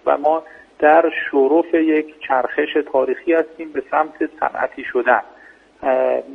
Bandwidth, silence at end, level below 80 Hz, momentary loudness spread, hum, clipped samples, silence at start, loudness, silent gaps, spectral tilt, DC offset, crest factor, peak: 4.4 kHz; 0 s; -62 dBFS; 8 LU; none; under 0.1%; 0.05 s; -18 LUFS; none; -6.5 dB/octave; under 0.1%; 18 dB; 0 dBFS